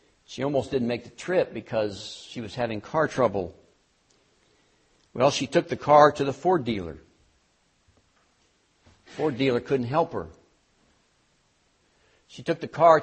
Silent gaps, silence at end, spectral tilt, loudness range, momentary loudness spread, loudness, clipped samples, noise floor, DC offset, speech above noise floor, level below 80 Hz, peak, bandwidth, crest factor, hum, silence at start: none; 0 s; -5.5 dB/octave; 8 LU; 18 LU; -25 LUFS; under 0.1%; -67 dBFS; under 0.1%; 43 dB; -60 dBFS; -4 dBFS; 8.4 kHz; 24 dB; none; 0.3 s